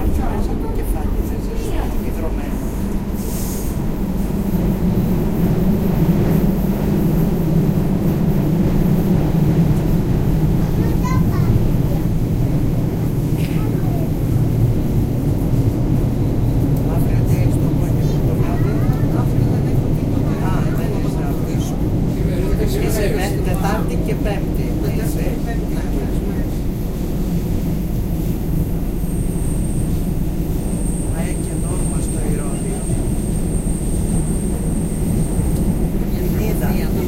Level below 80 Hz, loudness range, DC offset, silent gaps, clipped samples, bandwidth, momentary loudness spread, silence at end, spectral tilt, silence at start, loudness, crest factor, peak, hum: -22 dBFS; 5 LU; under 0.1%; none; under 0.1%; 16 kHz; 6 LU; 0 s; -7.5 dB/octave; 0 s; -19 LUFS; 14 dB; -4 dBFS; none